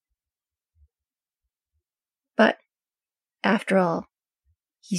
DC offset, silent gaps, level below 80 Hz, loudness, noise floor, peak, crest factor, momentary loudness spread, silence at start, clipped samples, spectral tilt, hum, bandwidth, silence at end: under 0.1%; none; -70 dBFS; -23 LUFS; under -90 dBFS; -6 dBFS; 24 dB; 11 LU; 2.4 s; under 0.1%; -5.5 dB/octave; none; 12 kHz; 0 s